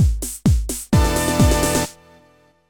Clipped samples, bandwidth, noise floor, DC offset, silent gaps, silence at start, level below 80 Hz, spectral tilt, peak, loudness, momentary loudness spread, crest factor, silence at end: under 0.1%; 20 kHz; -54 dBFS; under 0.1%; none; 0 s; -24 dBFS; -5 dB/octave; 0 dBFS; -19 LUFS; 6 LU; 18 dB; 0.8 s